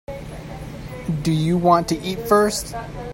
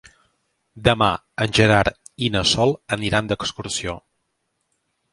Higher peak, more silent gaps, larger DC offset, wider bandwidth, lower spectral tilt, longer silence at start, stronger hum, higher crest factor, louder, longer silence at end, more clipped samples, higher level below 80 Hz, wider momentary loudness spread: about the same, -2 dBFS vs 0 dBFS; neither; neither; first, 16.5 kHz vs 11.5 kHz; about the same, -5.5 dB/octave vs -4.5 dB/octave; second, 0.1 s vs 0.75 s; neither; about the same, 20 dB vs 22 dB; about the same, -20 LUFS vs -20 LUFS; second, 0 s vs 1.15 s; neither; about the same, -40 dBFS vs -42 dBFS; first, 17 LU vs 10 LU